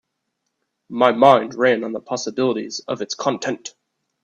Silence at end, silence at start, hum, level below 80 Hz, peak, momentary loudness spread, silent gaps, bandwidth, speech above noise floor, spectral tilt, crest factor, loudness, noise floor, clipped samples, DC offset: 0.55 s; 0.9 s; none; -68 dBFS; 0 dBFS; 13 LU; none; 8.4 kHz; 57 dB; -4 dB/octave; 20 dB; -19 LUFS; -76 dBFS; under 0.1%; under 0.1%